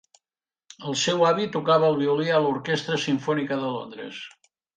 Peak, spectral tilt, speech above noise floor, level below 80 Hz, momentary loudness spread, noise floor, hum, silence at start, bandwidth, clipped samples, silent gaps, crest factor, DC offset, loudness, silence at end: -8 dBFS; -4.5 dB/octave; over 66 dB; -70 dBFS; 16 LU; under -90 dBFS; none; 0.8 s; 9.4 kHz; under 0.1%; none; 18 dB; under 0.1%; -23 LUFS; 0.5 s